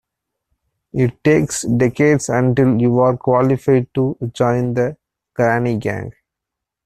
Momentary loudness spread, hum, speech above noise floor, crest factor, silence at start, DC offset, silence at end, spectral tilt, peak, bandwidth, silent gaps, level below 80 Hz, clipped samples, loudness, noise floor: 8 LU; none; 67 dB; 14 dB; 0.95 s; under 0.1%; 0.75 s; -7 dB/octave; -2 dBFS; 13.5 kHz; none; -48 dBFS; under 0.1%; -17 LUFS; -82 dBFS